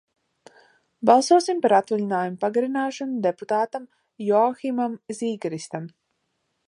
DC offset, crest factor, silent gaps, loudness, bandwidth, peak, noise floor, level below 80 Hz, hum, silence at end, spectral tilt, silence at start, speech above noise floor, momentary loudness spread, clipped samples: under 0.1%; 22 dB; none; -23 LUFS; 11.5 kHz; -2 dBFS; -74 dBFS; -78 dBFS; none; 0.8 s; -5 dB/octave; 1 s; 52 dB; 13 LU; under 0.1%